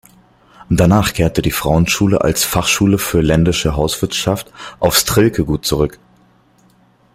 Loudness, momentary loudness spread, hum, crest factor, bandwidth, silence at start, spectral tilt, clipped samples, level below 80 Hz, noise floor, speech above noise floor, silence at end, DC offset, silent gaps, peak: -15 LUFS; 6 LU; none; 16 dB; 16 kHz; 0.6 s; -4.5 dB/octave; under 0.1%; -32 dBFS; -52 dBFS; 38 dB; 1.25 s; under 0.1%; none; 0 dBFS